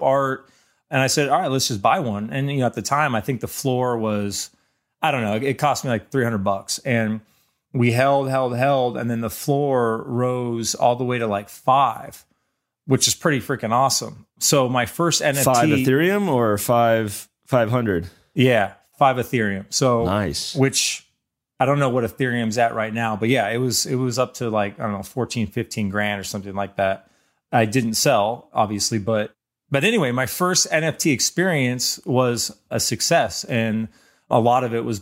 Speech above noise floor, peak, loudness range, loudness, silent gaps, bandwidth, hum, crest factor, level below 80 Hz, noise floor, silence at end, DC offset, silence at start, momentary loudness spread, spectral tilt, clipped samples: 55 dB; -4 dBFS; 4 LU; -21 LUFS; none; 16 kHz; none; 18 dB; -56 dBFS; -75 dBFS; 0 s; under 0.1%; 0 s; 8 LU; -4 dB/octave; under 0.1%